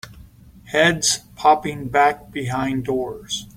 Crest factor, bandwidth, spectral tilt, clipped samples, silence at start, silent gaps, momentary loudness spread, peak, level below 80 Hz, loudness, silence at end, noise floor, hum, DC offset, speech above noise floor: 18 dB; 16.5 kHz; -3 dB/octave; under 0.1%; 0.05 s; none; 10 LU; -2 dBFS; -48 dBFS; -20 LUFS; 0.05 s; -45 dBFS; none; under 0.1%; 25 dB